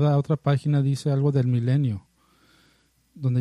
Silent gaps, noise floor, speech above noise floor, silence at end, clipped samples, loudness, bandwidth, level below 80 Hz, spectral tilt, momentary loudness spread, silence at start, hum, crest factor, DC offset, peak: none; -63 dBFS; 41 dB; 0 s; under 0.1%; -23 LUFS; 11 kHz; -60 dBFS; -8.5 dB/octave; 6 LU; 0 s; none; 14 dB; under 0.1%; -8 dBFS